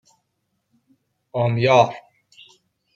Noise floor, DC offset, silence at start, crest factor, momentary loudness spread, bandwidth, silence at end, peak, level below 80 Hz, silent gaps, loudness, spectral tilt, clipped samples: -74 dBFS; under 0.1%; 1.35 s; 20 dB; 16 LU; 7.4 kHz; 0.95 s; -2 dBFS; -66 dBFS; none; -19 LUFS; -6 dB/octave; under 0.1%